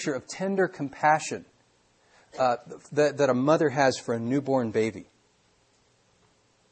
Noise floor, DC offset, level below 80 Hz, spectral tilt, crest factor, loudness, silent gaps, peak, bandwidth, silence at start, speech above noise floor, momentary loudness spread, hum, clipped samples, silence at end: -65 dBFS; under 0.1%; -70 dBFS; -5.5 dB/octave; 20 dB; -26 LUFS; none; -8 dBFS; 8.8 kHz; 0 s; 40 dB; 10 LU; none; under 0.1%; 1.7 s